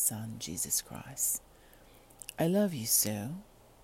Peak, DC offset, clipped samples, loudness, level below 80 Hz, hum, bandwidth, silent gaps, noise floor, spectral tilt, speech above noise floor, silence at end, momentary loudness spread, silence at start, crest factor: -12 dBFS; under 0.1%; under 0.1%; -31 LUFS; -62 dBFS; none; 16.5 kHz; none; -58 dBFS; -3.5 dB/octave; 25 dB; 0.4 s; 17 LU; 0 s; 22 dB